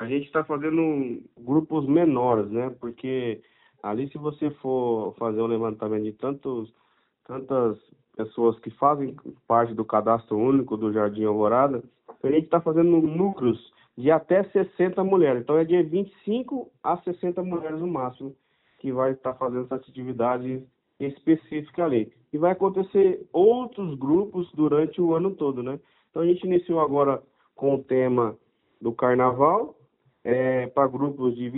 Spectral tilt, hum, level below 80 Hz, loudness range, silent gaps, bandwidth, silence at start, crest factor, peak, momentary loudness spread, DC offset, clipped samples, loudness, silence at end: -7.5 dB/octave; none; -66 dBFS; 6 LU; none; 4 kHz; 0 s; 18 dB; -6 dBFS; 12 LU; under 0.1%; under 0.1%; -24 LUFS; 0 s